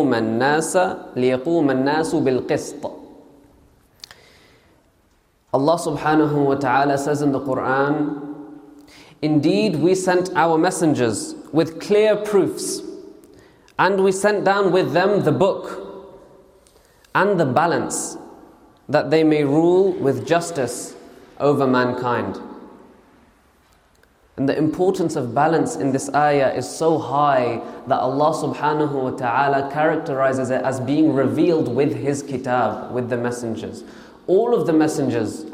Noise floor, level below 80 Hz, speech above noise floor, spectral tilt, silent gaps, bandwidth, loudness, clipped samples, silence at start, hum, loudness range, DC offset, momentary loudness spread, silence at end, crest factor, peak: -60 dBFS; -60 dBFS; 41 dB; -5.5 dB/octave; none; 16 kHz; -19 LUFS; under 0.1%; 0 s; none; 5 LU; under 0.1%; 11 LU; 0 s; 18 dB; -2 dBFS